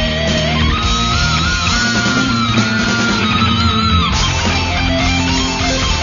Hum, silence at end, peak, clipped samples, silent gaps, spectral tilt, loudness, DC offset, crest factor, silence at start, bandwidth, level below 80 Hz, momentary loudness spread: none; 0 s; 0 dBFS; under 0.1%; none; -4 dB/octave; -14 LUFS; under 0.1%; 14 dB; 0 s; 7.4 kHz; -24 dBFS; 2 LU